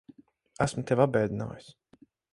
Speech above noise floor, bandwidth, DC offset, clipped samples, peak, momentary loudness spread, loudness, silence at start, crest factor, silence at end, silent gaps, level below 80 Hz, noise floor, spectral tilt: 33 dB; 11.5 kHz; under 0.1%; under 0.1%; -8 dBFS; 14 LU; -28 LUFS; 0.6 s; 22 dB; 0.7 s; none; -58 dBFS; -61 dBFS; -6.5 dB/octave